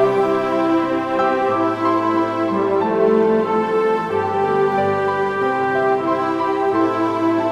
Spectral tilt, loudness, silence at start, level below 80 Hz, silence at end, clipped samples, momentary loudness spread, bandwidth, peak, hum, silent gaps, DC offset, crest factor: -7 dB/octave; -18 LUFS; 0 s; -58 dBFS; 0 s; under 0.1%; 3 LU; 10 kHz; -4 dBFS; none; none; under 0.1%; 14 dB